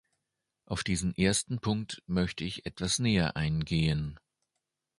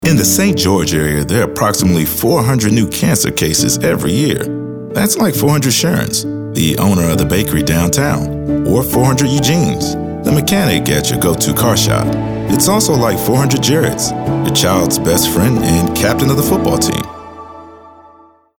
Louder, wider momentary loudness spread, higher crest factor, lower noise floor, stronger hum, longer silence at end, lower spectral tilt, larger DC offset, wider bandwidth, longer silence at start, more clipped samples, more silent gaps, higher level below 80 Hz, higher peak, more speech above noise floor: second, -31 LUFS vs -13 LUFS; first, 9 LU vs 6 LU; first, 20 dB vs 12 dB; first, -85 dBFS vs -45 dBFS; neither; first, 0.85 s vs 0.7 s; about the same, -4.5 dB/octave vs -4.5 dB/octave; neither; second, 11.5 kHz vs over 20 kHz; first, 0.7 s vs 0 s; neither; neither; second, -48 dBFS vs -34 dBFS; second, -12 dBFS vs 0 dBFS; first, 55 dB vs 32 dB